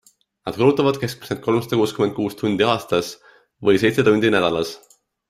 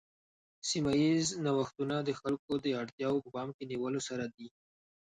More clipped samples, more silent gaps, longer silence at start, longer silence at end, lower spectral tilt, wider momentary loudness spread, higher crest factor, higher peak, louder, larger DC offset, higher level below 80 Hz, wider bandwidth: neither; second, none vs 2.39-2.48 s, 2.92-2.98 s, 3.54-3.59 s; second, 0.45 s vs 0.65 s; about the same, 0.55 s vs 0.65 s; about the same, -5.5 dB/octave vs -5 dB/octave; about the same, 12 LU vs 12 LU; about the same, 18 dB vs 16 dB; first, -2 dBFS vs -20 dBFS; first, -19 LUFS vs -34 LUFS; neither; first, -56 dBFS vs -68 dBFS; first, 15.5 kHz vs 10.5 kHz